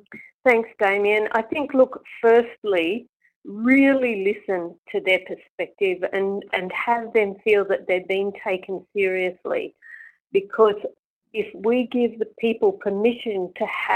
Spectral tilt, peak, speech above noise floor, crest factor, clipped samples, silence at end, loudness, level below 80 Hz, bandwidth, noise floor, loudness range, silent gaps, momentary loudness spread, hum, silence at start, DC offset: -6 dB/octave; -4 dBFS; 24 dB; 18 dB; under 0.1%; 0 s; -22 LUFS; -66 dBFS; 14.5 kHz; -45 dBFS; 4 LU; 0.34-0.40 s, 2.58-2.62 s, 3.09-3.20 s, 3.36-3.42 s, 4.78-4.83 s, 5.50-5.58 s, 10.20-10.25 s, 10.99-11.21 s; 11 LU; none; 0.1 s; under 0.1%